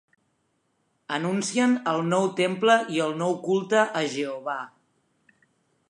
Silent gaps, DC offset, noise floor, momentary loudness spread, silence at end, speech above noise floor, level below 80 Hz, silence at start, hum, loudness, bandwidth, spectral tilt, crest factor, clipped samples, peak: none; under 0.1%; -72 dBFS; 11 LU; 1.2 s; 48 dB; -78 dBFS; 1.1 s; none; -25 LUFS; 11.5 kHz; -4.5 dB/octave; 20 dB; under 0.1%; -6 dBFS